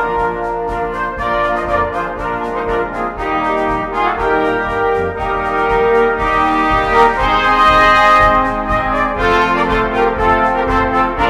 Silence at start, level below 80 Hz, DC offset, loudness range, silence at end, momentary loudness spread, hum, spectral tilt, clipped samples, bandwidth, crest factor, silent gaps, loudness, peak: 0 s; -30 dBFS; under 0.1%; 6 LU; 0 s; 10 LU; none; -5.5 dB/octave; under 0.1%; 14 kHz; 14 dB; none; -14 LUFS; 0 dBFS